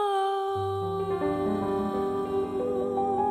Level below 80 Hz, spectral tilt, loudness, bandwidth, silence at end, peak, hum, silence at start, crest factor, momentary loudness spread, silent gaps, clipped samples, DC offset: -56 dBFS; -7 dB/octave; -28 LUFS; 13 kHz; 0 s; -16 dBFS; none; 0 s; 12 dB; 3 LU; none; under 0.1%; under 0.1%